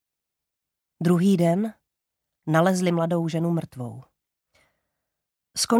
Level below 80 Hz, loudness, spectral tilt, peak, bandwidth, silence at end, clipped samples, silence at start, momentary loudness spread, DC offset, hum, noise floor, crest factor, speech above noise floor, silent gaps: -68 dBFS; -23 LUFS; -6 dB/octave; -6 dBFS; 15.5 kHz; 0 s; under 0.1%; 1 s; 16 LU; under 0.1%; none; -85 dBFS; 20 dB; 63 dB; none